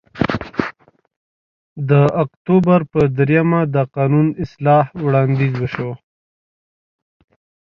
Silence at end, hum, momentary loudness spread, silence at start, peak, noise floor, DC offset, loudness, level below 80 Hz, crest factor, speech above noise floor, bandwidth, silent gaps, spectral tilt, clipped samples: 1.7 s; none; 10 LU; 0.15 s; 0 dBFS; -41 dBFS; under 0.1%; -16 LUFS; -46 dBFS; 18 dB; 25 dB; 6.2 kHz; 1.16-1.76 s, 2.37-2.45 s; -9.5 dB/octave; under 0.1%